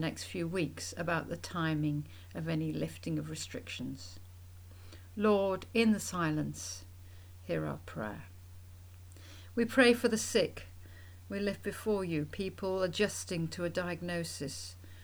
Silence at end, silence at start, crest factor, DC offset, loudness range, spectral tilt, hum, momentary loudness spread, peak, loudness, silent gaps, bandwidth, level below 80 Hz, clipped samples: 0 s; 0 s; 22 dB; under 0.1%; 7 LU; -5 dB/octave; none; 23 LU; -12 dBFS; -34 LUFS; none; over 20 kHz; -62 dBFS; under 0.1%